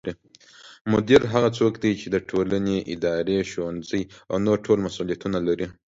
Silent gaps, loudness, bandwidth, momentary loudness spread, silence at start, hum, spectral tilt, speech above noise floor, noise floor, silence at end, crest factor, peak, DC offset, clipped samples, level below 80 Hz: 0.81-0.85 s; -23 LUFS; 7.8 kHz; 11 LU; 0.05 s; none; -6.5 dB/octave; 29 dB; -52 dBFS; 0.2 s; 22 dB; -2 dBFS; under 0.1%; under 0.1%; -52 dBFS